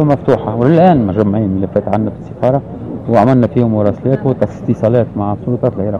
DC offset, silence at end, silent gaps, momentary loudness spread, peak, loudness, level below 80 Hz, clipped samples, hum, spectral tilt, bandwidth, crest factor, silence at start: 0.3%; 0 s; none; 8 LU; 0 dBFS; -13 LUFS; -42 dBFS; under 0.1%; none; -10 dB/octave; 7.2 kHz; 12 dB; 0 s